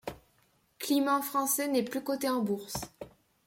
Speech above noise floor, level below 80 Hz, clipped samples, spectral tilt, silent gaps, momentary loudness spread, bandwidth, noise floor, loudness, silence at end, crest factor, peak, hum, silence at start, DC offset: 39 dB; -64 dBFS; under 0.1%; -3.5 dB/octave; none; 17 LU; 16.5 kHz; -69 dBFS; -31 LUFS; 0.4 s; 16 dB; -16 dBFS; none; 0.05 s; under 0.1%